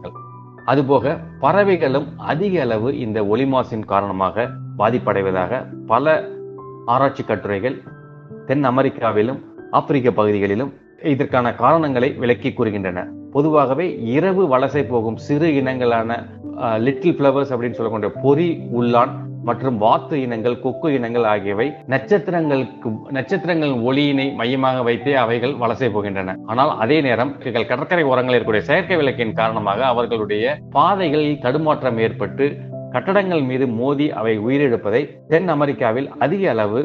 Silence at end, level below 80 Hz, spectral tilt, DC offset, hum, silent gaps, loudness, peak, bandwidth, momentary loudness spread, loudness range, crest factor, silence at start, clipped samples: 0 s; -56 dBFS; -8.5 dB/octave; under 0.1%; none; none; -19 LUFS; 0 dBFS; 7 kHz; 8 LU; 2 LU; 18 dB; 0 s; under 0.1%